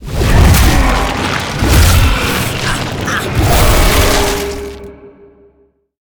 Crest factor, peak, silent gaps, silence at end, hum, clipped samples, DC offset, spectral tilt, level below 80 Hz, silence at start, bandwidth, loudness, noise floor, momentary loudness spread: 12 dB; 0 dBFS; none; 0.9 s; none; under 0.1%; under 0.1%; -4.5 dB/octave; -16 dBFS; 0 s; over 20 kHz; -12 LUFS; -53 dBFS; 9 LU